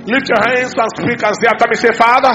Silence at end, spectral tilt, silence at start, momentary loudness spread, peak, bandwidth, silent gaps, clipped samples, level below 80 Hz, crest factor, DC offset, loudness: 0 s; -4 dB/octave; 0 s; 6 LU; 0 dBFS; 11 kHz; none; 0.4%; -52 dBFS; 12 dB; under 0.1%; -12 LUFS